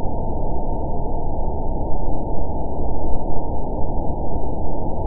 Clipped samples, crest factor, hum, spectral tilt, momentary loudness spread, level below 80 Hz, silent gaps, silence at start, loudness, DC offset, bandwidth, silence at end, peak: under 0.1%; 12 dB; none; -17 dB/octave; 1 LU; -24 dBFS; none; 0 s; -27 LUFS; 4%; 1.1 kHz; 0 s; -2 dBFS